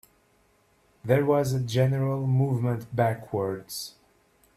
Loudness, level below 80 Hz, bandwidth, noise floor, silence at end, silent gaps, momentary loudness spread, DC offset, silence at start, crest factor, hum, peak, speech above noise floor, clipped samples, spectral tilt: -26 LUFS; -60 dBFS; 14 kHz; -65 dBFS; 0.65 s; none; 12 LU; under 0.1%; 1.05 s; 18 dB; none; -8 dBFS; 39 dB; under 0.1%; -7 dB/octave